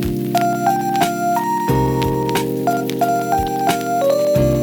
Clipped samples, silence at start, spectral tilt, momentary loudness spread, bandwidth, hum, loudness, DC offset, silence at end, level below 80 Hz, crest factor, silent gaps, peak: under 0.1%; 0 s; -6 dB/octave; 3 LU; over 20 kHz; none; -18 LUFS; under 0.1%; 0 s; -36 dBFS; 16 dB; none; 0 dBFS